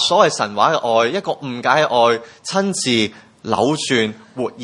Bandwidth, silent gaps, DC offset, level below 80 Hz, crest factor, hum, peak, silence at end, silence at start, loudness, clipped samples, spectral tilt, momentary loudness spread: 11.5 kHz; none; under 0.1%; -64 dBFS; 18 dB; none; 0 dBFS; 0 s; 0 s; -17 LUFS; under 0.1%; -3.5 dB/octave; 9 LU